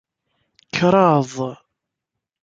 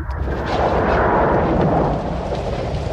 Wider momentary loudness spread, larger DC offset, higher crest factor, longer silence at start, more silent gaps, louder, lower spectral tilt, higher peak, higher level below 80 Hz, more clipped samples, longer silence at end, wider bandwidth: first, 14 LU vs 8 LU; neither; first, 20 dB vs 14 dB; first, 0.75 s vs 0 s; neither; about the same, -18 LUFS vs -19 LUFS; second, -6.5 dB/octave vs -8 dB/octave; about the same, -2 dBFS vs -4 dBFS; second, -60 dBFS vs -28 dBFS; neither; first, 0.9 s vs 0 s; second, 7.8 kHz vs 9 kHz